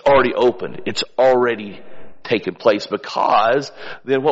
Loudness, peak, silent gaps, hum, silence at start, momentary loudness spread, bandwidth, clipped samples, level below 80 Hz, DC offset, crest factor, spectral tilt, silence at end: -18 LUFS; -2 dBFS; none; none; 0.05 s; 14 LU; 8 kHz; under 0.1%; -52 dBFS; under 0.1%; 14 dB; -3 dB/octave; 0 s